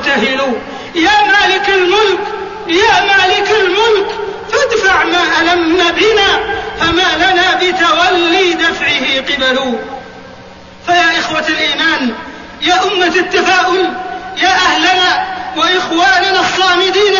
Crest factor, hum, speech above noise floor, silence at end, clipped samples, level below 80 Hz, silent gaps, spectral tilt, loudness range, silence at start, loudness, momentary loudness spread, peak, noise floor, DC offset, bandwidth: 12 dB; none; 23 dB; 0 s; under 0.1%; -42 dBFS; none; -2.5 dB/octave; 3 LU; 0 s; -10 LUFS; 10 LU; 0 dBFS; -34 dBFS; 0.3%; 7.4 kHz